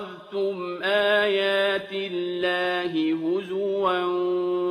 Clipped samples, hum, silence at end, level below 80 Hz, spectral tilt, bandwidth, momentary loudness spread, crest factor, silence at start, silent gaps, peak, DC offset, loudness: under 0.1%; none; 0 s; -70 dBFS; -5.5 dB/octave; 13.5 kHz; 8 LU; 16 dB; 0 s; none; -8 dBFS; under 0.1%; -24 LUFS